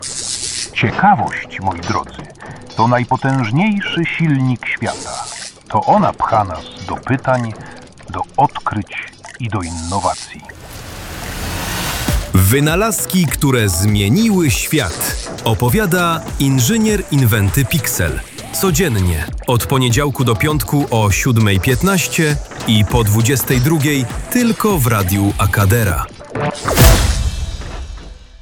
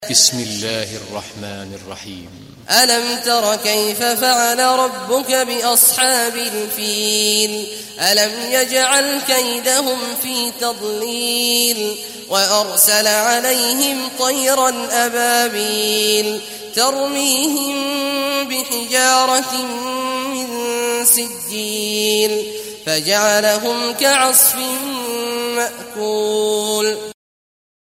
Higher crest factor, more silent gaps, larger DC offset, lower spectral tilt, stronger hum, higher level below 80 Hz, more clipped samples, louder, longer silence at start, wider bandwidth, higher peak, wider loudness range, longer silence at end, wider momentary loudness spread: about the same, 16 dB vs 18 dB; neither; first, 0.1% vs under 0.1%; first, -5 dB/octave vs -0.5 dB/octave; neither; first, -28 dBFS vs -62 dBFS; neither; about the same, -15 LUFS vs -15 LUFS; about the same, 0 s vs 0 s; first, 19 kHz vs 16 kHz; about the same, 0 dBFS vs 0 dBFS; first, 6 LU vs 3 LU; second, 0.05 s vs 0.85 s; about the same, 13 LU vs 11 LU